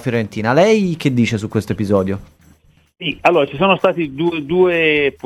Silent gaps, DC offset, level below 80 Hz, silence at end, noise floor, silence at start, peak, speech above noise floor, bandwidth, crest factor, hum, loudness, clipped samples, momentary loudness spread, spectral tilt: none; under 0.1%; -50 dBFS; 0.15 s; -51 dBFS; 0 s; 0 dBFS; 35 dB; 13.5 kHz; 16 dB; none; -16 LUFS; under 0.1%; 8 LU; -6.5 dB/octave